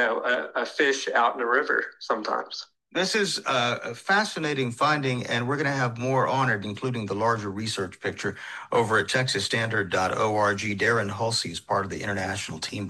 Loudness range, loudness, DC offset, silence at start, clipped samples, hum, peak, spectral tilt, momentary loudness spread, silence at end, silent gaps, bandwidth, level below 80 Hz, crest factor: 2 LU; -25 LUFS; under 0.1%; 0 s; under 0.1%; none; -8 dBFS; -4 dB/octave; 7 LU; 0 s; none; 12.5 kHz; -66 dBFS; 18 dB